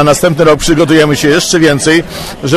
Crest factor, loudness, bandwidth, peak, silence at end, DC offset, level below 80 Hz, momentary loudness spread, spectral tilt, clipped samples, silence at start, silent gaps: 8 dB; -8 LUFS; 14 kHz; 0 dBFS; 0 s; under 0.1%; -30 dBFS; 4 LU; -4.5 dB/octave; 0.8%; 0 s; none